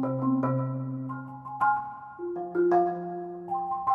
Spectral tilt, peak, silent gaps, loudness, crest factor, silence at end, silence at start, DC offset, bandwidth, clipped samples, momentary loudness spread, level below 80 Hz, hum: -11 dB/octave; -12 dBFS; none; -29 LUFS; 16 dB; 0 s; 0 s; under 0.1%; 3.1 kHz; under 0.1%; 13 LU; -68 dBFS; none